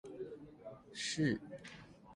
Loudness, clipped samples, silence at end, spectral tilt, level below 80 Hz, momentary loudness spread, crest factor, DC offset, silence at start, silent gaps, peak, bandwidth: -40 LUFS; under 0.1%; 0 s; -4.5 dB/octave; -70 dBFS; 18 LU; 20 dB; under 0.1%; 0.05 s; none; -22 dBFS; 11.5 kHz